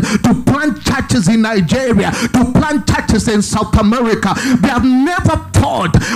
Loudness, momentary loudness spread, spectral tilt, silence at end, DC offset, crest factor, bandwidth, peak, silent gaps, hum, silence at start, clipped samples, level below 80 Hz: -13 LUFS; 2 LU; -5.5 dB/octave; 0 s; under 0.1%; 12 dB; 15.5 kHz; 0 dBFS; none; none; 0 s; under 0.1%; -28 dBFS